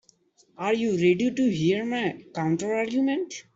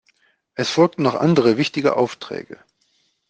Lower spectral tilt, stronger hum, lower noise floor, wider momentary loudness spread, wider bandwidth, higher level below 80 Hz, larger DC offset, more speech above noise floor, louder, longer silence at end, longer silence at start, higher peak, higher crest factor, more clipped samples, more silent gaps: about the same, -6 dB/octave vs -6 dB/octave; neither; about the same, -62 dBFS vs -65 dBFS; second, 8 LU vs 16 LU; second, 7.8 kHz vs 9.4 kHz; about the same, -66 dBFS vs -62 dBFS; neither; second, 37 dB vs 47 dB; second, -25 LUFS vs -18 LUFS; second, 0.15 s vs 0.75 s; about the same, 0.6 s vs 0.6 s; second, -10 dBFS vs -2 dBFS; about the same, 16 dB vs 18 dB; neither; neither